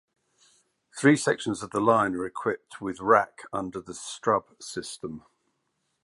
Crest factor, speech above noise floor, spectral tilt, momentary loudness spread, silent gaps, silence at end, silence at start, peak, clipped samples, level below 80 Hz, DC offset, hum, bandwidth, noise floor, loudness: 22 dB; 50 dB; -5 dB/octave; 15 LU; none; 0.85 s; 0.95 s; -6 dBFS; under 0.1%; -64 dBFS; under 0.1%; none; 11.5 kHz; -76 dBFS; -26 LUFS